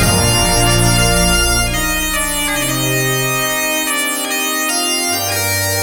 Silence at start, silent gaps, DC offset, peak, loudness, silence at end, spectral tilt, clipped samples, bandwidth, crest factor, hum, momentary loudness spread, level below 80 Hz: 0 s; none; under 0.1%; 0 dBFS; -14 LUFS; 0 s; -2.5 dB/octave; under 0.1%; 18 kHz; 14 dB; none; 4 LU; -24 dBFS